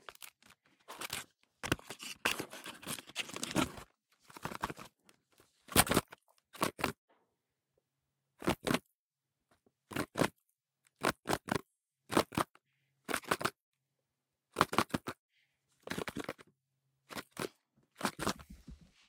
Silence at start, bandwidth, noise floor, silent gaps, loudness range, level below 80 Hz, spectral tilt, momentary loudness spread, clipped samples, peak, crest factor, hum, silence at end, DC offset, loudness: 0.1 s; 18 kHz; under -90 dBFS; 6.98-7.08 s, 8.95-9.11 s, 13.63-13.72 s, 15.19-15.29 s; 6 LU; -62 dBFS; -3.5 dB/octave; 21 LU; under 0.1%; -8 dBFS; 34 dB; none; 0.35 s; under 0.1%; -37 LUFS